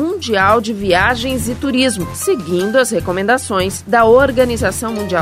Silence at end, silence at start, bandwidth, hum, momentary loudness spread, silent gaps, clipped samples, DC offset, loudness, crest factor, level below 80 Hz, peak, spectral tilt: 0 s; 0 s; 16 kHz; none; 8 LU; none; under 0.1%; under 0.1%; -14 LUFS; 14 dB; -36 dBFS; 0 dBFS; -4 dB/octave